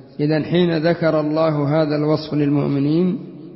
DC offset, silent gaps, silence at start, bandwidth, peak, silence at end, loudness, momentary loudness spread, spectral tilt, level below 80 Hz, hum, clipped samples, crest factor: under 0.1%; none; 0.2 s; 5.8 kHz; -4 dBFS; 0 s; -18 LUFS; 3 LU; -11.5 dB/octave; -56 dBFS; none; under 0.1%; 14 dB